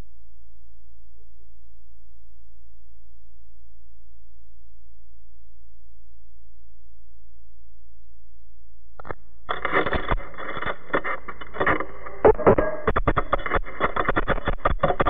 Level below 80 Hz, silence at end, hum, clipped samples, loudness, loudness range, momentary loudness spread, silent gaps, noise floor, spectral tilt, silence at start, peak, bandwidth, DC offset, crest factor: -36 dBFS; 0 s; none; under 0.1%; -24 LUFS; 11 LU; 16 LU; none; -53 dBFS; -8.5 dB/octave; 9.05 s; -6 dBFS; 4.4 kHz; 6%; 22 dB